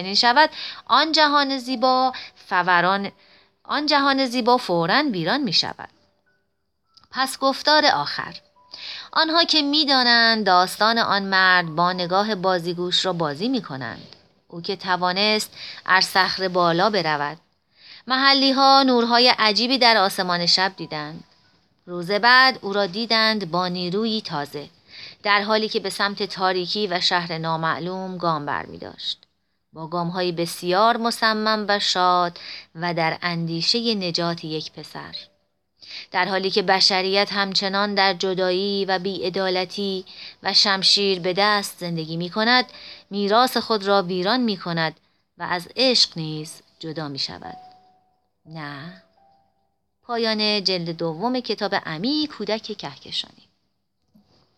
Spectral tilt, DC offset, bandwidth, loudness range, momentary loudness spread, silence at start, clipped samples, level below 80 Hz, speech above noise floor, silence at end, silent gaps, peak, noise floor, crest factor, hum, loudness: -3.5 dB/octave; under 0.1%; 16.5 kHz; 8 LU; 17 LU; 0 s; under 0.1%; -68 dBFS; 53 dB; 1.3 s; none; -2 dBFS; -74 dBFS; 20 dB; none; -20 LUFS